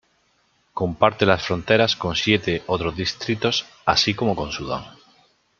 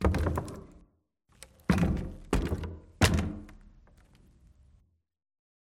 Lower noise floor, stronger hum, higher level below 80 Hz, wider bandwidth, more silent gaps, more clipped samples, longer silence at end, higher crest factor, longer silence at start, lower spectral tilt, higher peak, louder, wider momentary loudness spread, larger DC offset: second, -64 dBFS vs -70 dBFS; neither; second, -48 dBFS vs -40 dBFS; second, 7.6 kHz vs 16.5 kHz; neither; neither; second, 0.7 s vs 2.05 s; about the same, 22 dB vs 26 dB; first, 0.75 s vs 0 s; about the same, -4.5 dB/octave vs -5.5 dB/octave; first, -2 dBFS vs -6 dBFS; first, -21 LUFS vs -31 LUFS; second, 9 LU vs 19 LU; neither